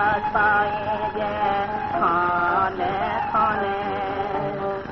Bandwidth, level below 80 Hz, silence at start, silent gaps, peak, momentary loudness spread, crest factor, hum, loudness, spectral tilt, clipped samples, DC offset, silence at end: 6.2 kHz; -48 dBFS; 0 s; none; -8 dBFS; 6 LU; 14 dB; none; -23 LUFS; -3 dB/octave; under 0.1%; under 0.1%; 0 s